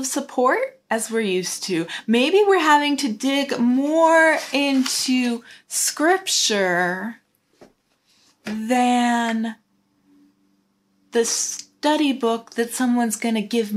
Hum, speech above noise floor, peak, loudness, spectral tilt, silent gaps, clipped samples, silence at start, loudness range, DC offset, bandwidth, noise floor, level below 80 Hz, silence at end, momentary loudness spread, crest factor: none; 45 dB; -4 dBFS; -20 LUFS; -2.5 dB/octave; none; under 0.1%; 0 s; 7 LU; under 0.1%; 16 kHz; -65 dBFS; -76 dBFS; 0 s; 10 LU; 18 dB